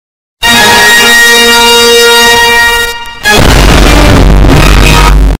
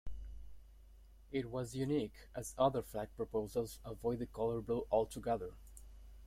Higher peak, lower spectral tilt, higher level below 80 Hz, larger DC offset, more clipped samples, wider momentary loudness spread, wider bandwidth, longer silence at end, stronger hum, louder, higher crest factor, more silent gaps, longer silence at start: first, 0 dBFS vs -20 dBFS; second, -3 dB/octave vs -6.5 dB/octave; first, -8 dBFS vs -56 dBFS; neither; first, 10% vs under 0.1%; second, 5 LU vs 19 LU; first, over 20 kHz vs 16.5 kHz; about the same, 0.05 s vs 0 s; neither; first, -2 LUFS vs -39 LUFS; second, 4 dB vs 20 dB; neither; first, 0.4 s vs 0.05 s